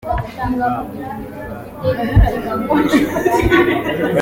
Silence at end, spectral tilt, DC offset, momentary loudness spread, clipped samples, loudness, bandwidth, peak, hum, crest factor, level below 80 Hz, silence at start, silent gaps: 0 s; -7 dB/octave; under 0.1%; 15 LU; under 0.1%; -17 LUFS; 17 kHz; -2 dBFS; none; 14 dB; -26 dBFS; 0.05 s; none